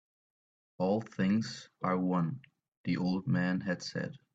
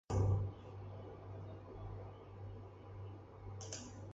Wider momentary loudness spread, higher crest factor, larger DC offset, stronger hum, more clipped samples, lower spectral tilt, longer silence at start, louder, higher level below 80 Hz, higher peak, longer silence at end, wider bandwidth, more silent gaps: second, 8 LU vs 16 LU; about the same, 16 dB vs 20 dB; neither; neither; neither; about the same, -7 dB/octave vs -6.5 dB/octave; first, 0.8 s vs 0.1 s; first, -33 LUFS vs -46 LUFS; second, -70 dBFS vs -54 dBFS; first, -18 dBFS vs -24 dBFS; first, 0.15 s vs 0 s; about the same, 8 kHz vs 8 kHz; first, 2.68-2.84 s vs none